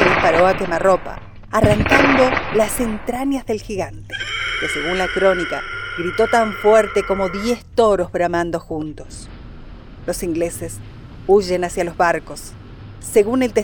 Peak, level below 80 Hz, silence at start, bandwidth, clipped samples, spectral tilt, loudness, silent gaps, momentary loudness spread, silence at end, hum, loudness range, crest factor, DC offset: 0 dBFS; -36 dBFS; 0 s; over 20 kHz; under 0.1%; -5 dB/octave; -18 LUFS; none; 19 LU; 0 s; none; 5 LU; 18 dB; under 0.1%